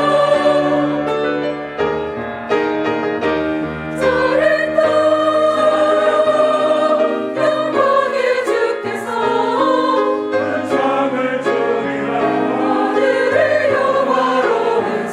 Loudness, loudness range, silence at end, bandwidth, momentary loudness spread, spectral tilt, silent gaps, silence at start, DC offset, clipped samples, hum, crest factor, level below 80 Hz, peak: -16 LUFS; 3 LU; 0 s; 11.5 kHz; 6 LU; -5.5 dB/octave; none; 0 s; under 0.1%; under 0.1%; none; 14 dB; -54 dBFS; -2 dBFS